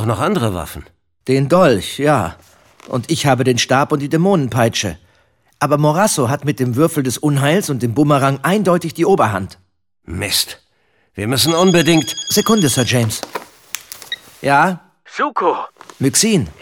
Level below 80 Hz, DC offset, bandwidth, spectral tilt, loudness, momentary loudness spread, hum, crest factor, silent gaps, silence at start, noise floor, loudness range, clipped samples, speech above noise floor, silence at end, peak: -48 dBFS; under 0.1%; 19.5 kHz; -4.5 dB/octave; -15 LUFS; 15 LU; none; 14 dB; none; 0 s; -61 dBFS; 2 LU; under 0.1%; 45 dB; 0.1 s; -2 dBFS